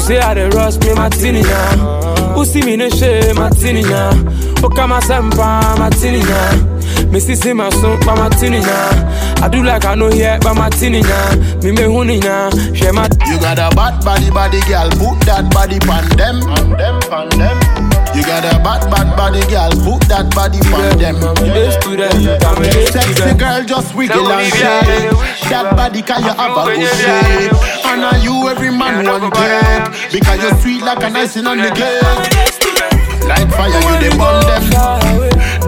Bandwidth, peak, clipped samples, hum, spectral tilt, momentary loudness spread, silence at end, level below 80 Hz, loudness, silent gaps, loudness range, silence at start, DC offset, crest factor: 18 kHz; 0 dBFS; under 0.1%; none; -5 dB/octave; 3 LU; 0 s; -14 dBFS; -11 LUFS; none; 1 LU; 0 s; under 0.1%; 10 dB